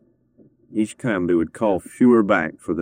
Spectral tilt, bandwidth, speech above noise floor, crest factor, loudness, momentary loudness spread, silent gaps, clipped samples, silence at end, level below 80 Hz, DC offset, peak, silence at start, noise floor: -7 dB/octave; 14 kHz; 36 dB; 16 dB; -20 LUFS; 10 LU; none; under 0.1%; 0 s; -58 dBFS; under 0.1%; -4 dBFS; 0.7 s; -55 dBFS